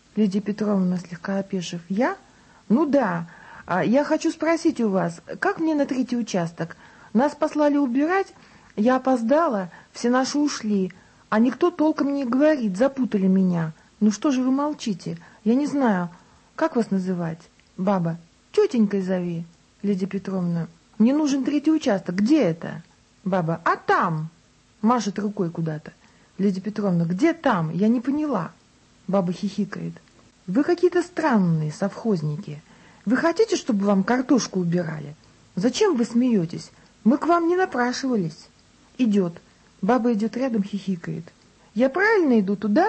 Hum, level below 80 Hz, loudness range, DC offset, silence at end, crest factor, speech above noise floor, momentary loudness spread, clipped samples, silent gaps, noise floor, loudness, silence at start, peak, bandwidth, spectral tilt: none; -64 dBFS; 3 LU; under 0.1%; 0 s; 16 dB; 34 dB; 12 LU; under 0.1%; none; -56 dBFS; -23 LUFS; 0.15 s; -8 dBFS; 8.6 kHz; -6.5 dB/octave